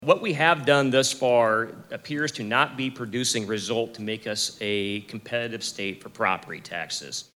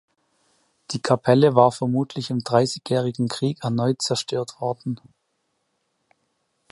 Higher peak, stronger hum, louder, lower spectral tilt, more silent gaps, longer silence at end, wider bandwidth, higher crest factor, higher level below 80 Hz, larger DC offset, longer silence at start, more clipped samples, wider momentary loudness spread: second, -6 dBFS vs -2 dBFS; neither; second, -25 LUFS vs -22 LUFS; second, -3.5 dB/octave vs -6 dB/octave; neither; second, 0.1 s vs 1.75 s; first, 16.5 kHz vs 11.5 kHz; about the same, 20 dB vs 22 dB; second, -72 dBFS vs -64 dBFS; neither; second, 0 s vs 0.9 s; neither; about the same, 12 LU vs 12 LU